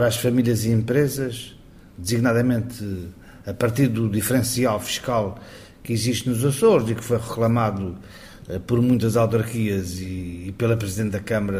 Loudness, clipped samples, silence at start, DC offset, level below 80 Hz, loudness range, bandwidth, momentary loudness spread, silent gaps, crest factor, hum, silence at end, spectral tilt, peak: -22 LUFS; under 0.1%; 0 s; under 0.1%; -48 dBFS; 2 LU; 16 kHz; 15 LU; none; 18 dB; none; 0 s; -6 dB/octave; -4 dBFS